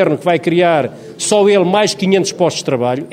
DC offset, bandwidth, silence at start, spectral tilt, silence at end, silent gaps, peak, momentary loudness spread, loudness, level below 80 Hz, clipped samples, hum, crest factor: under 0.1%; 15.5 kHz; 0 s; -4.5 dB/octave; 0 s; none; 0 dBFS; 6 LU; -14 LUFS; -60 dBFS; under 0.1%; none; 14 dB